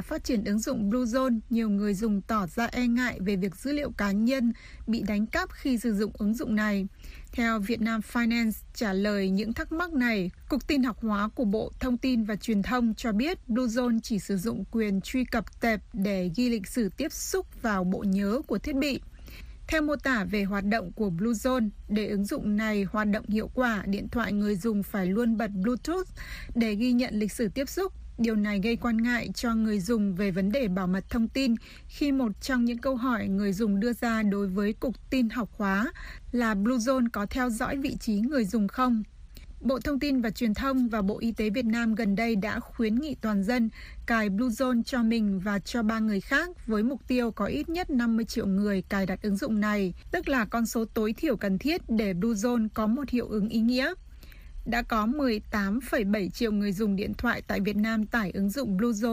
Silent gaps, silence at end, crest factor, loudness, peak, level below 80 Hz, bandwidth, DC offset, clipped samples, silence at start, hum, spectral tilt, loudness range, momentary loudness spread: none; 0 s; 16 dB; -28 LUFS; -12 dBFS; -46 dBFS; 15.5 kHz; under 0.1%; under 0.1%; 0 s; none; -6 dB/octave; 1 LU; 4 LU